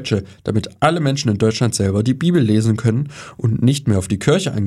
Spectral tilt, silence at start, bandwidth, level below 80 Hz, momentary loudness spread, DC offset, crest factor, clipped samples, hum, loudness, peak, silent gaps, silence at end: -6 dB/octave; 0 s; 13 kHz; -48 dBFS; 6 LU; under 0.1%; 16 dB; under 0.1%; none; -18 LUFS; 0 dBFS; none; 0 s